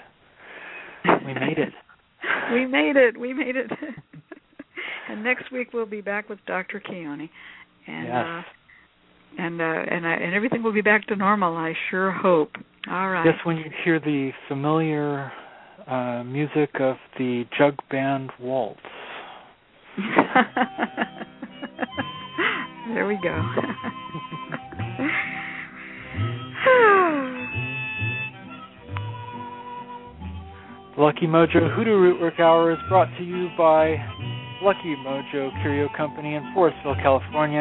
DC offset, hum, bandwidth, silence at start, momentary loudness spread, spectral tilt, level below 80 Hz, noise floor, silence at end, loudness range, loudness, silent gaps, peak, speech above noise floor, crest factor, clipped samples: under 0.1%; none; 4.1 kHz; 0 s; 19 LU; -10 dB/octave; -56 dBFS; -57 dBFS; 0 s; 9 LU; -23 LUFS; none; 0 dBFS; 34 dB; 24 dB; under 0.1%